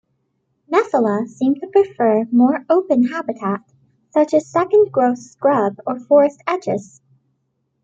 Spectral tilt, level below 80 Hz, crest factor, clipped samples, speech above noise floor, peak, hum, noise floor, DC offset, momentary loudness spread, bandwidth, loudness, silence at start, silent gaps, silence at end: -7 dB/octave; -66 dBFS; 16 dB; under 0.1%; 53 dB; -2 dBFS; none; -70 dBFS; under 0.1%; 9 LU; 7.8 kHz; -17 LUFS; 0.7 s; none; 1 s